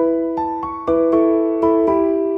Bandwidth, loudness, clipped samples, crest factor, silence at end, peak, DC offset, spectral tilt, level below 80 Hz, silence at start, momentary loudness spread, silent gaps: 3.8 kHz; -17 LUFS; under 0.1%; 12 dB; 0 s; -4 dBFS; under 0.1%; -9.5 dB/octave; -46 dBFS; 0 s; 7 LU; none